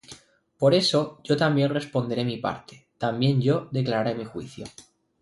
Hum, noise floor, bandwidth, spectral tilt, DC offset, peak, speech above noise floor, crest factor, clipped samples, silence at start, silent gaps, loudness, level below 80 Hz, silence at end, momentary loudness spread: none; -50 dBFS; 11.5 kHz; -6 dB/octave; under 0.1%; -8 dBFS; 26 dB; 18 dB; under 0.1%; 0.1 s; none; -24 LUFS; -62 dBFS; 0.4 s; 16 LU